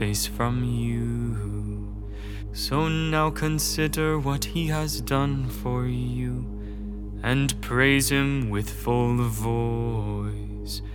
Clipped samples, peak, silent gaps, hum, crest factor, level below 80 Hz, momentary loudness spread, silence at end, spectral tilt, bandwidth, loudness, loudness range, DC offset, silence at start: under 0.1%; -6 dBFS; none; none; 18 dB; -34 dBFS; 12 LU; 0 s; -5 dB/octave; over 20 kHz; -26 LUFS; 3 LU; under 0.1%; 0 s